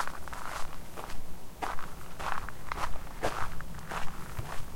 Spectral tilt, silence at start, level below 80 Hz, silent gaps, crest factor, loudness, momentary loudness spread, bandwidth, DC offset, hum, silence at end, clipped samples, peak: -4 dB/octave; 0 s; -44 dBFS; none; 18 dB; -39 LUFS; 8 LU; 16.5 kHz; 2%; none; 0 s; under 0.1%; -12 dBFS